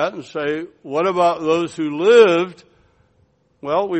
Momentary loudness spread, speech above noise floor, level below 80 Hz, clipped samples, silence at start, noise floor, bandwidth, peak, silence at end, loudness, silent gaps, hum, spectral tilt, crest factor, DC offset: 15 LU; 43 dB; -64 dBFS; under 0.1%; 0 s; -60 dBFS; 8.6 kHz; 0 dBFS; 0 s; -17 LUFS; none; none; -5.5 dB/octave; 18 dB; under 0.1%